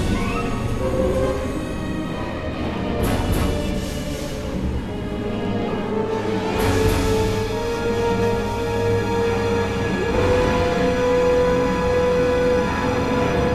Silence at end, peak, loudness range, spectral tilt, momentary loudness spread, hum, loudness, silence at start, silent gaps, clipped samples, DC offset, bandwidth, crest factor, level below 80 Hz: 0 s; -6 dBFS; 6 LU; -6 dB/octave; 8 LU; none; -21 LUFS; 0 s; none; under 0.1%; 0.5%; 14 kHz; 14 dB; -30 dBFS